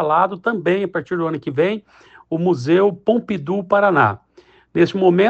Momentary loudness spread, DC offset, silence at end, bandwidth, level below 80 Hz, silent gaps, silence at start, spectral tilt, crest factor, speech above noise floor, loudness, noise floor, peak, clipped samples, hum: 8 LU; under 0.1%; 0 s; 7.8 kHz; -60 dBFS; none; 0 s; -7.5 dB/octave; 16 dB; 34 dB; -18 LUFS; -51 dBFS; -2 dBFS; under 0.1%; none